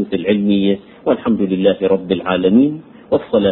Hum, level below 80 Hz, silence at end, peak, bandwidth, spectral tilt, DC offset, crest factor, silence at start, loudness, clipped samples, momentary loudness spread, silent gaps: none; -48 dBFS; 0 s; 0 dBFS; 4.1 kHz; -12 dB/octave; under 0.1%; 14 dB; 0 s; -16 LUFS; under 0.1%; 7 LU; none